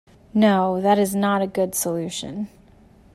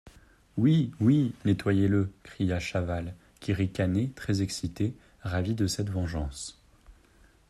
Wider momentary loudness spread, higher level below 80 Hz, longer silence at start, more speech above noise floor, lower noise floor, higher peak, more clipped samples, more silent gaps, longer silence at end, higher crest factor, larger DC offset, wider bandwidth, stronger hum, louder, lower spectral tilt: about the same, 13 LU vs 12 LU; second, -56 dBFS vs -50 dBFS; first, 0.35 s vs 0.05 s; about the same, 30 dB vs 32 dB; second, -51 dBFS vs -60 dBFS; first, -6 dBFS vs -12 dBFS; neither; neither; about the same, 0.7 s vs 0.6 s; about the same, 16 dB vs 18 dB; neither; first, 15.5 kHz vs 13 kHz; neither; first, -21 LUFS vs -29 LUFS; second, -5 dB/octave vs -6.5 dB/octave